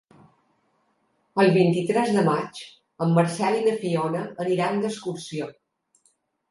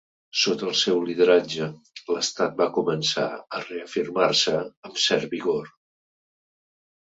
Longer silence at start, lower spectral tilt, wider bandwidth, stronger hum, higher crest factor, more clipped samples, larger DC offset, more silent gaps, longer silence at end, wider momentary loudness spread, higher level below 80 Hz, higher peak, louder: first, 1.35 s vs 0.35 s; first, -6.5 dB/octave vs -3 dB/octave; first, 11.5 kHz vs 8 kHz; neither; about the same, 20 dB vs 20 dB; neither; neither; second, none vs 4.77-4.83 s; second, 1 s vs 1.45 s; about the same, 13 LU vs 12 LU; about the same, -72 dBFS vs -68 dBFS; about the same, -6 dBFS vs -6 dBFS; about the same, -23 LUFS vs -24 LUFS